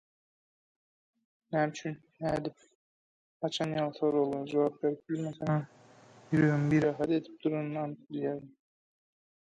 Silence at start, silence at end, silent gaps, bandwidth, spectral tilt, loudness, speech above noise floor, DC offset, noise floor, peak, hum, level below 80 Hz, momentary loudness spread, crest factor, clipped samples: 1.5 s; 1.05 s; 2.75-3.40 s; 10 kHz; -7 dB/octave; -32 LUFS; 26 dB; under 0.1%; -57 dBFS; -14 dBFS; none; -66 dBFS; 11 LU; 18 dB; under 0.1%